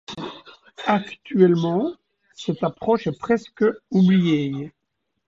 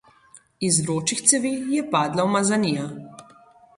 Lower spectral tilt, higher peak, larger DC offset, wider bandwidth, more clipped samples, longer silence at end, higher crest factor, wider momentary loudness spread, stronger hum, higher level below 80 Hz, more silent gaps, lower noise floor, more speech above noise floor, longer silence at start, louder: first, -8 dB/octave vs -3.5 dB/octave; about the same, -4 dBFS vs -2 dBFS; neither; second, 7.6 kHz vs 11.5 kHz; neither; about the same, 0.6 s vs 0.55 s; about the same, 18 dB vs 22 dB; first, 15 LU vs 10 LU; neither; about the same, -60 dBFS vs -62 dBFS; neither; first, -77 dBFS vs -53 dBFS; first, 57 dB vs 31 dB; second, 0.1 s vs 0.35 s; about the same, -21 LUFS vs -21 LUFS